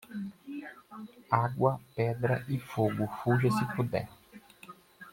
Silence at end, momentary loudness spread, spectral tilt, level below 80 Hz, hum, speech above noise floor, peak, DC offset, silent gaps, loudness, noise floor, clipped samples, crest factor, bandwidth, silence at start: 0 s; 22 LU; -7.5 dB/octave; -64 dBFS; none; 23 dB; -10 dBFS; under 0.1%; none; -31 LUFS; -53 dBFS; under 0.1%; 22 dB; 16.5 kHz; 0.1 s